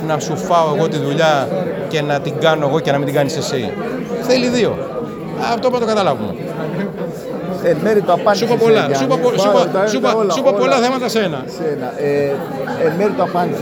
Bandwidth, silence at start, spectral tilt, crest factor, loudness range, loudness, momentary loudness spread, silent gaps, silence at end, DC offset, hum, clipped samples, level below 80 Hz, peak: over 20 kHz; 0 s; -5.5 dB/octave; 16 dB; 4 LU; -16 LUFS; 9 LU; none; 0 s; under 0.1%; none; under 0.1%; -54 dBFS; 0 dBFS